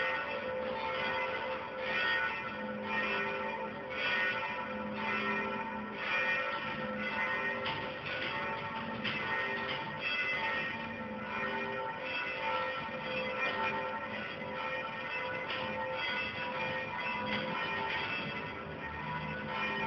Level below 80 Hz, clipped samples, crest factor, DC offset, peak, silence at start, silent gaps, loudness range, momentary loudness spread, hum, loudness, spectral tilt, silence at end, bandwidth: -64 dBFS; under 0.1%; 16 dB; under 0.1%; -20 dBFS; 0 s; none; 2 LU; 7 LU; none; -35 LUFS; -1.5 dB/octave; 0 s; 6.6 kHz